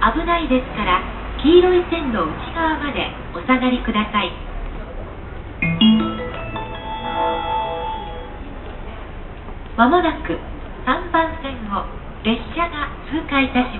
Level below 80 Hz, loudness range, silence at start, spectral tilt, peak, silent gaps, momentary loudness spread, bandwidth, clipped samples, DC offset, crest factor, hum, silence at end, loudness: -32 dBFS; 5 LU; 0 s; -10.5 dB/octave; 0 dBFS; none; 19 LU; 4.3 kHz; under 0.1%; under 0.1%; 20 dB; none; 0 s; -20 LUFS